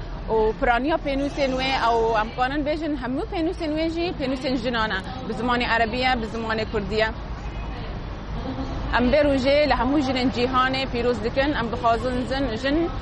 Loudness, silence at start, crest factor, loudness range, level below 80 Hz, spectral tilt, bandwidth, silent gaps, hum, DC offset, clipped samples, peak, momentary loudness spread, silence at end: -23 LUFS; 0 s; 16 dB; 4 LU; -34 dBFS; -6 dB/octave; 9.8 kHz; none; none; under 0.1%; under 0.1%; -6 dBFS; 11 LU; 0 s